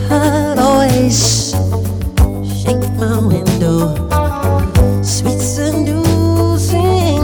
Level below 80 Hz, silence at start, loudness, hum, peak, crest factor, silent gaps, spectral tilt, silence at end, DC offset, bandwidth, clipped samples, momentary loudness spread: -22 dBFS; 0 s; -14 LUFS; none; -2 dBFS; 10 dB; none; -5.5 dB/octave; 0 s; under 0.1%; 20 kHz; under 0.1%; 5 LU